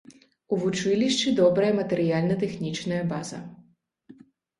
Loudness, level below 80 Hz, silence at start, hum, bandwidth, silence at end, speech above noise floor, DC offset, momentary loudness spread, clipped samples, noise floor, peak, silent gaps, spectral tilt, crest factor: -25 LUFS; -64 dBFS; 0.1 s; none; 11.5 kHz; 0.5 s; 36 dB; under 0.1%; 12 LU; under 0.1%; -60 dBFS; -8 dBFS; none; -5.5 dB/octave; 18 dB